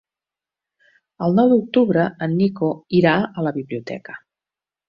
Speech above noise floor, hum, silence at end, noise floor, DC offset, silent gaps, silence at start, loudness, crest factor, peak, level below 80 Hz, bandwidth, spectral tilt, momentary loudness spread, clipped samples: 71 dB; none; 0.7 s; -89 dBFS; under 0.1%; none; 1.2 s; -19 LUFS; 18 dB; -2 dBFS; -60 dBFS; 6 kHz; -9 dB/octave; 16 LU; under 0.1%